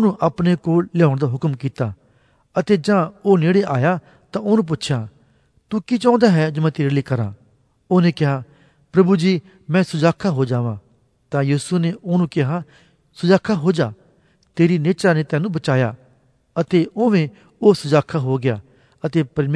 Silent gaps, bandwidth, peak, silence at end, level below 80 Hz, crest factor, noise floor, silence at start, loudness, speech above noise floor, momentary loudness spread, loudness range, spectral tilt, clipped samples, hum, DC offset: none; 11 kHz; -2 dBFS; 0 s; -58 dBFS; 18 dB; -58 dBFS; 0 s; -19 LUFS; 40 dB; 10 LU; 2 LU; -7.5 dB/octave; under 0.1%; none; under 0.1%